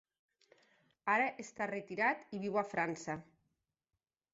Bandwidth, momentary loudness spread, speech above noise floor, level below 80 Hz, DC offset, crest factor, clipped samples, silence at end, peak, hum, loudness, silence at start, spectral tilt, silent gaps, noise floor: 8 kHz; 10 LU; over 53 dB; -80 dBFS; under 0.1%; 20 dB; under 0.1%; 1.1 s; -20 dBFS; none; -37 LUFS; 1.05 s; -4 dB/octave; none; under -90 dBFS